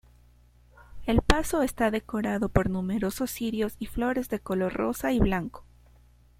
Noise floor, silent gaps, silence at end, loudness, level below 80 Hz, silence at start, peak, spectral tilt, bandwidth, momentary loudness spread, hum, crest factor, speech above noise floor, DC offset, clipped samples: -57 dBFS; none; 0.75 s; -28 LUFS; -38 dBFS; 0.8 s; 0 dBFS; -5.5 dB/octave; 16.5 kHz; 6 LU; 60 Hz at -50 dBFS; 28 dB; 31 dB; under 0.1%; under 0.1%